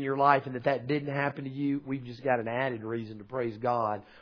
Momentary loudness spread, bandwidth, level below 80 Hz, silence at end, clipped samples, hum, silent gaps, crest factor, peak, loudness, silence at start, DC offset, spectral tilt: 11 LU; 5.4 kHz; -68 dBFS; 0 s; under 0.1%; none; none; 22 dB; -8 dBFS; -30 LUFS; 0 s; under 0.1%; -8.5 dB/octave